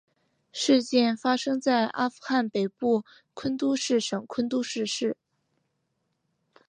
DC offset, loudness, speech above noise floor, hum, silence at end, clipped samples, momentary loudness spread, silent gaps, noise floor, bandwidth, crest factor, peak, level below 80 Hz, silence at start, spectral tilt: under 0.1%; -26 LUFS; 51 dB; none; 1.55 s; under 0.1%; 8 LU; none; -77 dBFS; 10 kHz; 18 dB; -10 dBFS; -72 dBFS; 0.55 s; -4 dB/octave